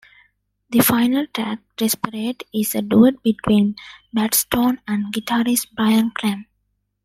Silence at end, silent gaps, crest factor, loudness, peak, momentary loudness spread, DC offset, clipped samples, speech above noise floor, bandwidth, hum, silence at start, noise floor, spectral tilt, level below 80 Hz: 0.6 s; none; 18 dB; -19 LUFS; -2 dBFS; 10 LU; under 0.1%; under 0.1%; 52 dB; 16 kHz; none; 0.7 s; -71 dBFS; -4 dB/octave; -54 dBFS